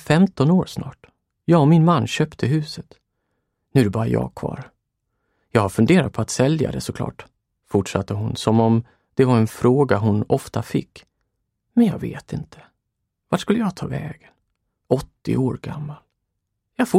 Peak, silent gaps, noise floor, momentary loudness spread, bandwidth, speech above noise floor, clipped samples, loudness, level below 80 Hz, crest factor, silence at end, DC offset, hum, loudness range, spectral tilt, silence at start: -2 dBFS; none; -77 dBFS; 15 LU; 15.5 kHz; 58 dB; under 0.1%; -20 LUFS; -50 dBFS; 18 dB; 0 s; under 0.1%; none; 6 LU; -7 dB/octave; 0.05 s